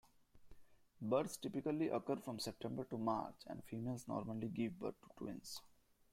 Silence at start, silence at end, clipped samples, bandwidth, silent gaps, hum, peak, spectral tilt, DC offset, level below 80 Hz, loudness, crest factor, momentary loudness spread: 0.35 s; 0.45 s; under 0.1%; 16 kHz; none; none; -24 dBFS; -6 dB/octave; under 0.1%; -74 dBFS; -44 LUFS; 20 dB; 11 LU